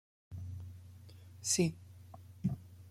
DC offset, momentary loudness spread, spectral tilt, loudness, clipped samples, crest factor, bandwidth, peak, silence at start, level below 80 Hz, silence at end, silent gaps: under 0.1%; 23 LU; -4 dB/octave; -37 LUFS; under 0.1%; 22 dB; 16 kHz; -18 dBFS; 0.3 s; -66 dBFS; 0 s; none